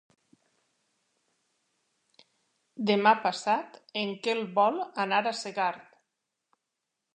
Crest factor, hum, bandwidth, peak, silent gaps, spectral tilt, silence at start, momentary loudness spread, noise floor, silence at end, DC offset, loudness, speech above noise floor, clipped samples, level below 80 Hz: 24 dB; none; 9.6 kHz; -8 dBFS; none; -4 dB/octave; 2.75 s; 10 LU; -84 dBFS; 1.35 s; under 0.1%; -28 LUFS; 57 dB; under 0.1%; -86 dBFS